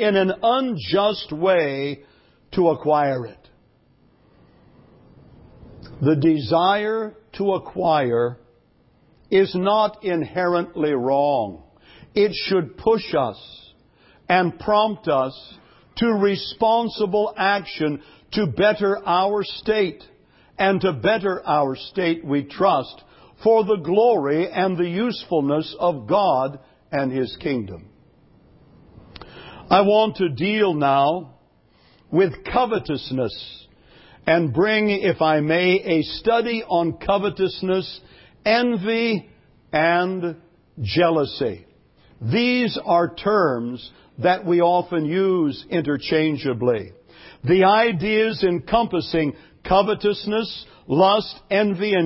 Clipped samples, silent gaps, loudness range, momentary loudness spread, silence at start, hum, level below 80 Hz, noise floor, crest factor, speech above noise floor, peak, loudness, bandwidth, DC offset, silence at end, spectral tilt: under 0.1%; none; 4 LU; 10 LU; 0 s; none; -52 dBFS; -58 dBFS; 20 dB; 38 dB; -2 dBFS; -21 LUFS; 5.8 kHz; under 0.1%; 0 s; -10 dB/octave